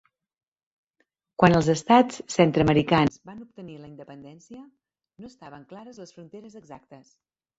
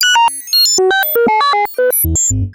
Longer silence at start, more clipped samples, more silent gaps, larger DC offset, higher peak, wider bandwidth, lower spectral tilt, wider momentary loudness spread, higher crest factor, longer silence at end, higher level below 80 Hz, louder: first, 1.4 s vs 0 s; neither; neither; neither; about the same, -4 dBFS vs -2 dBFS; second, 8 kHz vs 17.5 kHz; first, -6 dB/octave vs -2 dB/octave; first, 25 LU vs 4 LU; first, 22 dB vs 10 dB; first, 0.65 s vs 0 s; second, -54 dBFS vs -32 dBFS; second, -21 LUFS vs -11 LUFS